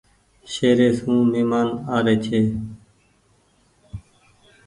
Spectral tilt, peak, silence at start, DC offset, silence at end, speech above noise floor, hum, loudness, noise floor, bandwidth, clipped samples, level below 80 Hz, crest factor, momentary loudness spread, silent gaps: -6.5 dB/octave; -4 dBFS; 0.45 s; under 0.1%; 0.65 s; 41 dB; none; -20 LUFS; -60 dBFS; 11 kHz; under 0.1%; -50 dBFS; 18 dB; 23 LU; none